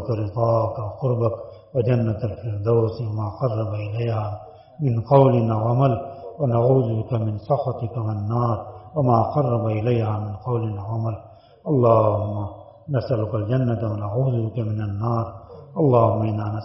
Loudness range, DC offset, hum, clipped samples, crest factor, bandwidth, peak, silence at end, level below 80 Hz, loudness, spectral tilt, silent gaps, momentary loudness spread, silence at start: 4 LU; under 0.1%; none; under 0.1%; 20 dB; 5.8 kHz; -2 dBFS; 0 s; -52 dBFS; -22 LUFS; -9.5 dB/octave; none; 10 LU; 0 s